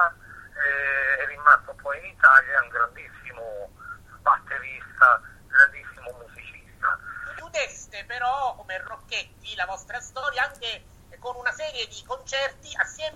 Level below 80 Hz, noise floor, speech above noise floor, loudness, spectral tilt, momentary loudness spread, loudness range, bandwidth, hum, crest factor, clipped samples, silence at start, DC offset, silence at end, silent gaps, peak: -54 dBFS; -45 dBFS; 21 dB; -23 LUFS; -1 dB/octave; 23 LU; 10 LU; 13.5 kHz; none; 22 dB; under 0.1%; 0 s; under 0.1%; 0.05 s; none; -2 dBFS